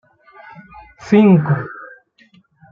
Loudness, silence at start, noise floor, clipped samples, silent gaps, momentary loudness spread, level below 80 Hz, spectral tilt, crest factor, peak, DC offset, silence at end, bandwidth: -14 LUFS; 1 s; -53 dBFS; under 0.1%; none; 25 LU; -56 dBFS; -9 dB/octave; 16 dB; -2 dBFS; under 0.1%; 0.85 s; 7 kHz